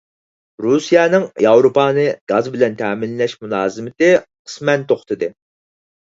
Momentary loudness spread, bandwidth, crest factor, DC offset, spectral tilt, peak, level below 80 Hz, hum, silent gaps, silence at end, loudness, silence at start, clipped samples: 11 LU; 7.8 kHz; 16 dB; under 0.1%; -5.5 dB/octave; 0 dBFS; -62 dBFS; none; 2.21-2.27 s, 4.39-4.45 s; 0.8 s; -16 LUFS; 0.6 s; under 0.1%